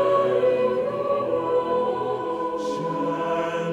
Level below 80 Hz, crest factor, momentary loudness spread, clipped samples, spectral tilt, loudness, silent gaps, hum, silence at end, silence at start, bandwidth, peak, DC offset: -62 dBFS; 14 dB; 6 LU; under 0.1%; -6.5 dB/octave; -24 LUFS; none; none; 0 s; 0 s; 9.8 kHz; -10 dBFS; under 0.1%